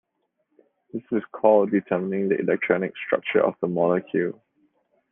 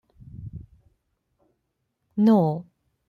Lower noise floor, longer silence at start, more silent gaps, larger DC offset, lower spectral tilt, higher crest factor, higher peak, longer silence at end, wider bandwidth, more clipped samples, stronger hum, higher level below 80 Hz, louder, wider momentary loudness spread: about the same, -74 dBFS vs -77 dBFS; first, 0.95 s vs 0.35 s; neither; neither; about the same, -10 dB/octave vs -10 dB/octave; about the same, 20 dB vs 18 dB; first, -4 dBFS vs -8 dBFS; first, 0.8 s vs 0.45 s; second, 3.7 kHz vs 5.4 kHz; neither; neither; second, -72 dBFS vs -56 dBFS; about the same, -23 LUFS vs -22 LUFS; second, 10 LU vs 23 LU